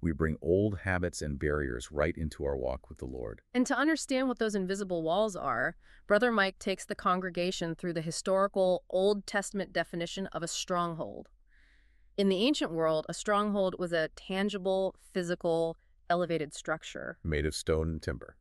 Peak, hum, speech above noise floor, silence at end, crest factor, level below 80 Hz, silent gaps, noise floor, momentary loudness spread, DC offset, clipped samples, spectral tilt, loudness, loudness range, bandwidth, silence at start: -12 dBFS; none; 31 dB; 0.1 s; 20 dB; -48 dBFS; none; -62 dBFS; 8 LU; under 0.1%; under 0.1%; -5 dB/octave; -32 LUFS; 3 LU; 13 kHz; 0 s